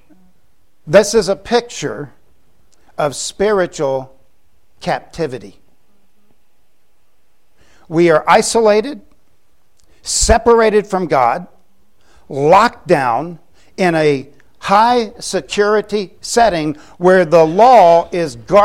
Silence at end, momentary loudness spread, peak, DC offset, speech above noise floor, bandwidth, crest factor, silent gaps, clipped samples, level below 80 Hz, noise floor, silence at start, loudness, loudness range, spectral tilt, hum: 0 s; 14 LU; 0 dBFS; 0.7%; 50 dB; 16 kHz; 14 dB; none; under 0.1%; -36 dBFS; -63 dBFS; 0.85 s; -13 LUFS; 10 LU; -4 dB/octave; none